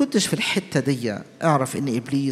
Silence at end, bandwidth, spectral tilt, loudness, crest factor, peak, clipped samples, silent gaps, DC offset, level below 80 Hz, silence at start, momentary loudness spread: 0 s; 16 kHz; -5 dB/octave; -23 LUFS; 18 dB; -4 dBFS; under 0.1%; none; under 0.1%; -64 dBFS; 0 s; 5 LU